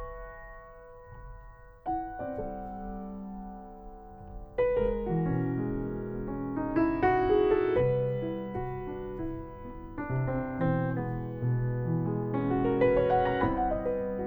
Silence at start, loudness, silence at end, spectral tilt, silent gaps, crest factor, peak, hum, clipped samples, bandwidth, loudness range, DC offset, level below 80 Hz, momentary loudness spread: 0 s; -30 LUFS; 0 s; -10.5 dB/octave; none; 18 dB; -14 dBFS; none; under 0.1%; over 20 kHz; 11 LU; under 0.1%; -46 dBFS; 22 LU